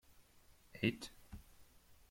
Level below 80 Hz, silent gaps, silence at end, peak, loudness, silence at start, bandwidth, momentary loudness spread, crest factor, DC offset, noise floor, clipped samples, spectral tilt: -64 dBFS; none; 0.15 s; -22 dBFS; -42 LUFS; 0.2 s; 16.5 kHz; 20 LU; 26 dB; under 0.1%; -67 dBFS; under 0.1%; -5.5 dB/octave